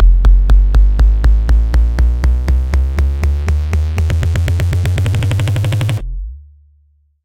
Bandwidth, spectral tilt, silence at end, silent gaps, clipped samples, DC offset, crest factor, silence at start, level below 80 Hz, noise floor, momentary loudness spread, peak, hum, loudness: 10 kHz; -6.5 dB/octave; 0.85 s; none; under 0.1%; under 0.1%; 12 dB; 0 s; -12 dBFS; -53 dBFS; 5 LU; 0 dBFS; none; -14 LUFS